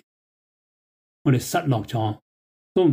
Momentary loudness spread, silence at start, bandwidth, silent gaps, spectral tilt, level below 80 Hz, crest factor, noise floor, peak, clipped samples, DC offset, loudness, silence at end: 7 LU; 1.25 s; 16 kHz; 2.22-2.75 s; -6.5 dB/octave; -60 dBFS; 16 dB; under -90 dBFS; -8 dBFS; under 0.1%; under 0.1%; -24 LUFS; 0 s